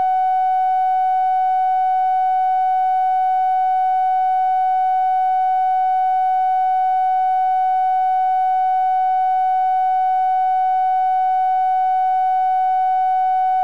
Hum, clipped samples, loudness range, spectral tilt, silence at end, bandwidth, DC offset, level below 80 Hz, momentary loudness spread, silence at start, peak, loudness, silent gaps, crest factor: none; under 0.1%; 0 LU; -1 dB/octave; 0 s; 4.7 kHz; 0.9%; -80 dBFS; 0 LU; 0 s; -12 dBFS; -17 LUFS; none; 4 dB